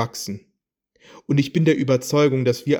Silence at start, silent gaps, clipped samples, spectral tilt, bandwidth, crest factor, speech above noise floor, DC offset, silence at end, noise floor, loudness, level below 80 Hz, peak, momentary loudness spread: 0 s; none; under 0.1%; -6 dB/octave; over 20 kHz; 16 dB; 50 dB; under 0.1%; 0 s; -70 dBFS; -20 LUFS; -64 dBFS; -6 dBFS; 13 LU